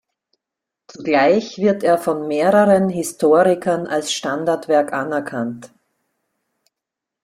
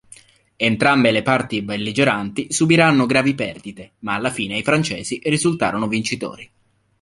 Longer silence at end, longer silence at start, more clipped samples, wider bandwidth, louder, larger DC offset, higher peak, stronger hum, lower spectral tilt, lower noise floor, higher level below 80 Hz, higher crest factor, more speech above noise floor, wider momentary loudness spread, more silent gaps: first, 1.6 s vs 0.55 s; first, 1 s vs 0.6 s; neither; first, 15.5 kHz vs 11.5 kHz; about the same, -17 LUFS vs -18 LUFS; neither; about the same, -2 dBFS vs -2 dBFS; neither; about the same, -5 dB/octave vs -4.5 dB/octave; first, -84 dBFS vs -48 dBFS; second, -62 dBFS vs -54 dBFS; about the same, 16 dB vs 18 dB; first, 67 dB vs 29 dB; about the same, 10 LU vs 11 LU; neither